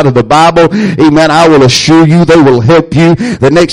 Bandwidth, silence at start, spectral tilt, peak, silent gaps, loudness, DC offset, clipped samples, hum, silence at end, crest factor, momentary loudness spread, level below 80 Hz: 11.5 kHz; 0 s; -6 dB/octave; 0 dBFS; none; -5 LUFS; under 0.1%; 2%; none; 0 s; 4 dB; 4 LU; -32 dBFS